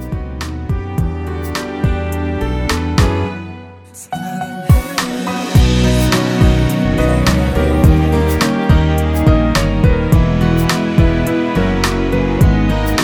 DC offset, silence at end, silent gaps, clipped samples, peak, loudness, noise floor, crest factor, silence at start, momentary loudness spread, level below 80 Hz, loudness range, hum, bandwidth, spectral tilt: under 0.1%; 0 s; none; under 0.1%; 0 dBFS; -15 LUFS; -35 dBFS; 14 dB; 0 s; 10 LU; -18 dBFS; 6 LU; none; 19.5 kHz; -6 dB/octave